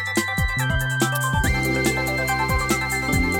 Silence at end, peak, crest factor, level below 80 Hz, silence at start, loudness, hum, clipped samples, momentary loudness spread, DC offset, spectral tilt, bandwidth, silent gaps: 0 s; -6 dBFS; 16 dB; -30 dBFS; 0 s; -21 LUFS; none; under 0.1%; 1 LU; under 0.1%; -4.5 dB/octave; over 20 kHz; none